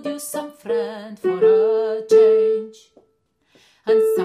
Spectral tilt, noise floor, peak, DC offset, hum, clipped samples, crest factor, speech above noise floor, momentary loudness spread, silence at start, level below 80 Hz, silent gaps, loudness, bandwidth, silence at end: -4.5 dB/octave; -65 dBFS; -6 dBFS; under 0.1%; none; under 0.1%; 14 dB; 45 dB; 16 LU; 0.05 s; -76 dBFS; none; -18 LUFS; 15 kHz; 0 s